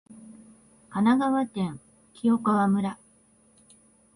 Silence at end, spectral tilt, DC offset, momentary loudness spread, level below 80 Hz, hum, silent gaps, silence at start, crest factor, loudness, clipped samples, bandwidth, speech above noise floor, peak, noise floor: 1.2 s; -7 dB/octave; under 0.1%; 13 LU; -66 dBFS; none; none; 0.1 s; 16 dB; -25 LUFS; under 0.1%; 10.5 kHz; 37 dB; -10 dBFS; -61 dBFS